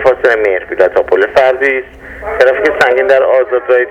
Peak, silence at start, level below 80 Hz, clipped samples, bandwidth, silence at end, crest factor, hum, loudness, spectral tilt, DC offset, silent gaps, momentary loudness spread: 0 dBFS; 0 s; -40 dBFS; 0.4%; 9.6 kHz; 0 s; 10 dB; none; -10 LUFS; -4.5 dB/octave; under 0.1%; none; 7 LU